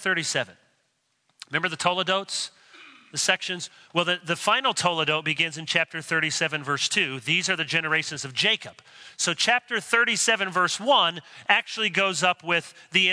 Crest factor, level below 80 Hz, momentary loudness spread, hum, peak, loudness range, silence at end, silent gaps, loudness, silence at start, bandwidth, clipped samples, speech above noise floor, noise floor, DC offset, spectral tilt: 22 dB; -76 dBFS; 8 LU; none; -4 dBFS; 5 LU; 0 s; none; -24 LUFS; 0 s; 11 kHz; under 0.1%; 47 dB; -72 dBFS; under 0.1%; -2 dB/octave